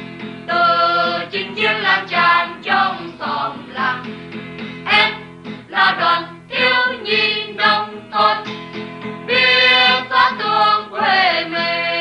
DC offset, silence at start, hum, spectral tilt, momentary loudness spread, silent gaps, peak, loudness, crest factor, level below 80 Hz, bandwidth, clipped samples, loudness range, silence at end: under 0.1%; 0 s; none; -4 dB/octave; 16 LU; none; 0 dBFS; -15 LUFS; 16 dB; -58 dBFS; 10.5 kHz; under 0.1%; 4 LU; 0 s